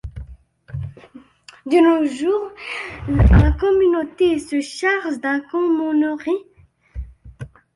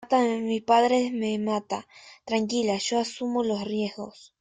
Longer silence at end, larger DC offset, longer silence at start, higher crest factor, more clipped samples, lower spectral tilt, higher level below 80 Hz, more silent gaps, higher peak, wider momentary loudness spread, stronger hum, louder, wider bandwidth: about the same, 0.3 s vs 0.3 s; neither; about the same, 0.05 s vs 0 s; about the same, 18 dB vs 18 dB; neither; first, -7.5 dB/octave vs -4.5 dB/octave; first, -26 dBFS vs -68 dBFS; neither; first, -2 dBFS vs -8 dBFS; first, 22 LU vs 13 LU; neither; first, -18 LUFS vs -26 LUFS; first, 11.5 kHz vs 9.6 kHz